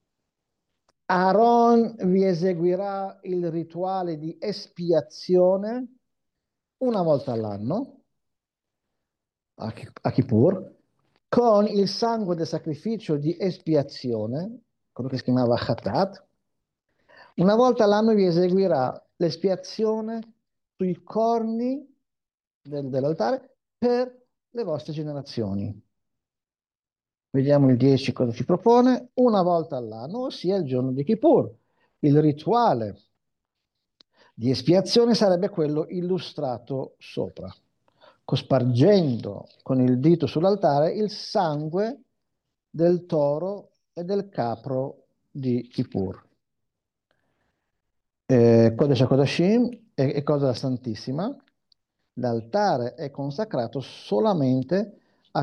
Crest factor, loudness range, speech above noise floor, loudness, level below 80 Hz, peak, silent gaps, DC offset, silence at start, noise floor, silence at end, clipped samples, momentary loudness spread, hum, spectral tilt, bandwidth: 18 dB; 7 LU; over 67 dB; -23 LUFS; -68 dBFS; -6 dBFS; 22.34-22.38 s, 22.47-22.61 s; under 0.1%; 1.1 s; under -90 dBFS; 0 s; under 0.1%; 14 LU; none; -7.5 dB/octave; 9.6 kHz